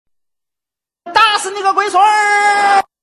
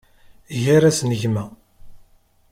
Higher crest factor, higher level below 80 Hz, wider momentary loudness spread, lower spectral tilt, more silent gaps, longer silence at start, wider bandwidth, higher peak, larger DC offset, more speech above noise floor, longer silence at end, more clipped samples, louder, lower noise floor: about the same, 14 dB vs 16 dB; second, -58 dBFS vs -52 dBFS; second, 5 LU vs 15 LU; second, 0 dB/octave vs -5.5 dB/octave; neither; first, 1.05 s vs 0.5 s; second, 12.5 kHz vs 16 kHz; first, 0 dBFS vs -4 dBFS; neither; first, 74 dB vs 36 dB; second, 0.2 s vs 0.55 s; neither; first, -12 LUFS vs -19 LUFS; first, -86 dBFS vs -54 dBFS